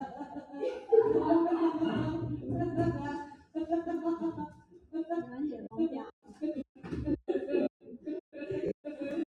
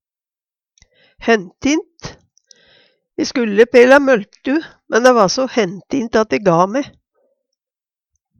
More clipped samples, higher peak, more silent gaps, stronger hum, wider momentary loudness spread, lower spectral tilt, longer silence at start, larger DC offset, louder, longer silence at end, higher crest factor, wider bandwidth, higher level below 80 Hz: neither; second, -12 dBFS vs 0 dBFS; first, 6.13-6.22 s, 6.69-6.75 s, 7.70-7.80 s, 8.20-8.32 s, 8.74-8.84 s vs none; neither; about the same, 15 LU vs 15 LU; first, -9 dB/octave vs -4.5 dB/octave; second, 0 s vs 1.2 s; neither; second, -33 LUFS vs -15 LUFS; second, 0.05 s vs 1.5 s; about the same, 20 dB vs 16 dB; second, 7.2 kHz vs 10.5 kHz; about the same, -58 dBFS vs -54 dBFS